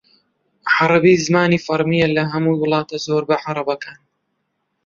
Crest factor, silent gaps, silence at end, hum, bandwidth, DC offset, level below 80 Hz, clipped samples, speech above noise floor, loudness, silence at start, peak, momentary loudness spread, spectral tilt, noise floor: 16 dB; none; 0.95 s; none; 7.6 kHz; under 0.1%; -56 dBFS; under 0.1%; 55 dB; -17 LUFS; 0.65 s; -2 dBFS; 10 LU; -5.5 dB/octave; -71 dBFS